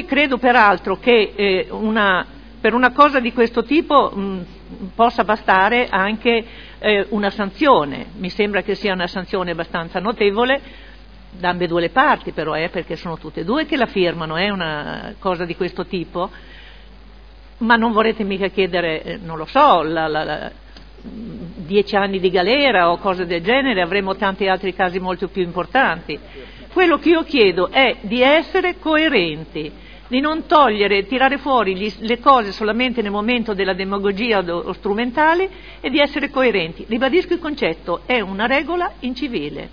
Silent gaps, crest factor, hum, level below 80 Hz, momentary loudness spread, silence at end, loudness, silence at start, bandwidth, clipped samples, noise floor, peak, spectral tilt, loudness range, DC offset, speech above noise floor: none; 18 dB; none; -42 dBFS; 12 LU; 0 s; -18 LUFS; 0 s; 5.4 kHz; under 0.1%; -41 dBFS; 0 dBFS; -7 dB/octave; 5 LU; 0.4%; 24 dB